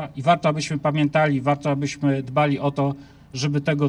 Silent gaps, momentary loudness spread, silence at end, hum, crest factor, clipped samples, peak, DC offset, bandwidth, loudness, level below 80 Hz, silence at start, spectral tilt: none; 6 LU; 0 s; none; 16 dB; under 0.1%; -6 dBFS; under 0.1%; 10.5 kHz; -22 LUFS; -56 dBFS; 0 s; -6.5 dB/octave